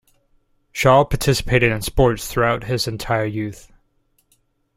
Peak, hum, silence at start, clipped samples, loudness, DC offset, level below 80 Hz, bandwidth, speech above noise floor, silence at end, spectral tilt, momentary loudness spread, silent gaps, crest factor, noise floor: -2 dBFS; none; 0.75 s; under 0.1%; -19 LUFS; under 0.1%; -34 dBFS; 16 kHz; 46 dB; 1.15 s; -5 dB/octave; 10 LU; none; 18 dB; -64 dBFS